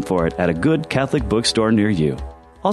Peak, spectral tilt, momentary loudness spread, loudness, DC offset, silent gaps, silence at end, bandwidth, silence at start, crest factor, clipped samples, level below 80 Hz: -4 dBFS; -5.5 dB/octave; 7 LU; -19 LUFS; under 0.1%; none; 0 s; 12.5 kHz; 0 s; 16 dB; under 0.1%; -36 dBFS